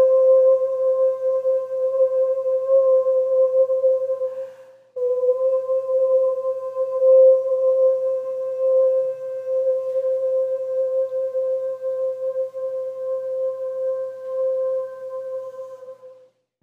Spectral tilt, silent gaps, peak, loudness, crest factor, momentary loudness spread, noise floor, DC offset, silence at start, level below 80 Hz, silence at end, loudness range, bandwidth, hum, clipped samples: -5 dB/octave; none; -6 dBFS; -20 LUFS; 14 dB; 13 LU; -53 dBFS; under 0.1%; 0 s; -82 dBFS; 0.5 s; 7 LU; 1.7 kHz; none; under 0.1%